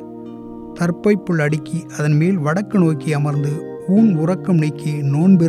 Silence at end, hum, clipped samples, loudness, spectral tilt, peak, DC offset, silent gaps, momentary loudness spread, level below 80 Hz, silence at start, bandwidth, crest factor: 0 s; none; under 0.1%; -18 LUFS; -8 dB/octave; -4 dBFS; under 0.1%; none; 12 LU; -56 dBFS; 0 s; 12 kHz; 14 dB